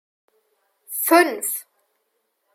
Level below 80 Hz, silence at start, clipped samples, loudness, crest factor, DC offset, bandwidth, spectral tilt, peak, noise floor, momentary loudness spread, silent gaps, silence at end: -88 dBFS; 0.9 s; under 0.1%; -20 LUFS; 20 dB; under 0.1%; 16.5 kHz; -0.5 dB/octave; -4 dBFS; -72 dBFS; 14 LU; none; 0.9 s